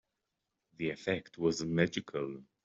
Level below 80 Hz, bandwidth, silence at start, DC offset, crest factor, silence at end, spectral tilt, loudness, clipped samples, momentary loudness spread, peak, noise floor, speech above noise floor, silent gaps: -68 dBFS; 7.8 kHz; 0.8 s; under 0.1%; 22 dB; 0.2 s; -5.5 dB/octave; -35 LUFS; under 0.1%; 8 LU; -14 dBFS; -86 dBFS; 52 dB; none